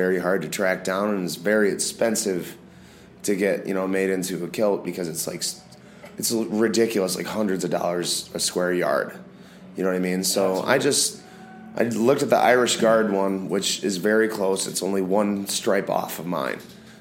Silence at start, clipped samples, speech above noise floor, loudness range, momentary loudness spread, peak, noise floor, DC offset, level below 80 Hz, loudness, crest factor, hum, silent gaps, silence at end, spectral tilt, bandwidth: 0 s; under 0.1%; 24 dB; 5 LU; 10 LU; -2 dBFS; -47 dBFS; under 0.1%; -66 dBFS; -23 LUFS; 20 dB; none; none; 0.05 s; -3.5 dB/octave; 16.5 kHz